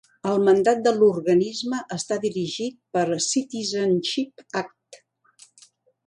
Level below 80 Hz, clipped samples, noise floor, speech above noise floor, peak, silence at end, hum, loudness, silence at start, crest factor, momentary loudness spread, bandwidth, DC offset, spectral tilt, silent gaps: -70 dBFS; under 0.1%; -56 dBFS; 34 dB; -6 dBFS; 1.1 s; none; -23 LUFS; 0.25 s; 16 dB; 12 LU; 11.5 kHz; under 0.1%; -4.5 dB/octave; none